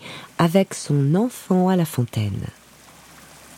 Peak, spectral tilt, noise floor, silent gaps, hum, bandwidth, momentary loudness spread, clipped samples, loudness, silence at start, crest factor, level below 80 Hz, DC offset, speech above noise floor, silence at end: -2 dBFS; -6.5 dB/octave; -48 dBFS; none; none; 16.5 kHz; 12 LU; under 0.1%; -21 LUFS; 0 s; 20 dB; -56 dBFS; under 0.1%; 28 dB; 0.05 s